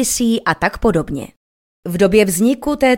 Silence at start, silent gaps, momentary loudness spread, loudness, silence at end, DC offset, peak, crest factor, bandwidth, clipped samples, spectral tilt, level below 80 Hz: 0 s; 1.37-1.83 s; 14 LU; -16 LUFS; 0 s; under 0.1%; 0 dBFS; 16 dB; 17 kHz; under 0.1%; -4.5 dB/octave; -36 dBFS